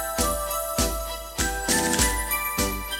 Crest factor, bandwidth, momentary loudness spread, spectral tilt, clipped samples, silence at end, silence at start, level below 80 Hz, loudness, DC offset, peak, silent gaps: 20 dB; 17.5 kHz; 6 LU; -2.5 dB/octave; under 0.1%; 0 s; 0 s; -34 dBFS; -24 LUFS; under 0.1%; -6 dBFS; none